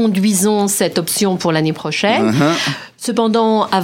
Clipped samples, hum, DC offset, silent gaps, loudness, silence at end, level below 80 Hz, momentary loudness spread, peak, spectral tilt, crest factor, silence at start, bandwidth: under 0.1%; none; under 0.1%; none; -15 LUFS; 0 s; -60 dBFS; 5 LU; 0 dBFS; -4 dB/octave; 14 dB; 0 s; 17 kHz